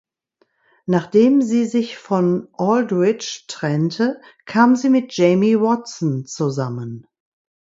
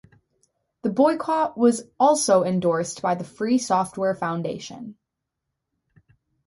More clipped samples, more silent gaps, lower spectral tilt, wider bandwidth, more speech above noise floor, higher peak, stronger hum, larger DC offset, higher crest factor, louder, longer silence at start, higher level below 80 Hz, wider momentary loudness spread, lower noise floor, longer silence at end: neither; neither; first, -6.5 dB/octave vs -5 dB/octave; second, 7.8 kHz vs 11.5 kHz; second, 47 dB vs 60 dB; first, 0 dBFS vs -6 dBFS; neither; neither; about the same, 18 dB vs 18 dB; first, -18 LUFS vs -22 LUFS; about the same, 0.9 s vs 0.85 s; about the same, -64 dBFS vs -66 dBFS; about the same, 12 LU vs 12 LU; second, -65 dBFS vs -82 dBFS; second, 0.75 s vs 1.55 s